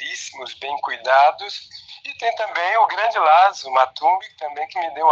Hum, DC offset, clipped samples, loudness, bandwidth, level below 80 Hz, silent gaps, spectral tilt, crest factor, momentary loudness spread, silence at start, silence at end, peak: none; under 0.1%; under 0.1%; -19 LUFS; 7.8 kHz; -74 dBFS; none; 0 dB/octave; 18 dB; 16 LU; 0 s; 0 s; -2 dBFS